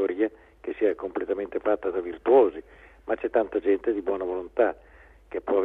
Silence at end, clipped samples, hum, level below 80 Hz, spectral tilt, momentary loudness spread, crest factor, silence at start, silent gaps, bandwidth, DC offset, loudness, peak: 0 s; under 0.1%; none; -56 dBFS; -8 dB/octave; 16 LU; 18 dB; 0 s; none; 3.9 kHz; under 0.1%; -26 LUFS; -8 dBFS